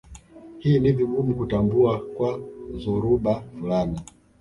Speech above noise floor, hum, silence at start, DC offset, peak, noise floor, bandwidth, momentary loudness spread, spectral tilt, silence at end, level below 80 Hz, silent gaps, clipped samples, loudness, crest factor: 22 dB; none; 0.1 s; under 0.1%; -8 dBFS; -44 dBFS; 11 kHz; 11 LU; -9 dB/octave; 0.35 s; -44 dBFS; none; under 0.1%; -23 LUFS; 16 dB